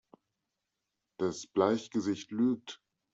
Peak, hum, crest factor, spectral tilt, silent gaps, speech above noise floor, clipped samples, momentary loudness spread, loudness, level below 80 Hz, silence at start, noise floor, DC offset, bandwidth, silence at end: -12 dBFS; none; 22 dB; -5.5 dB/octave; none; 55 dB; under 0.1%; 11 LU; -32 LUFS; -76 dBFS; 1.2 s; -86 dBFS; under 0.1%; 8 kHz; 0.4 s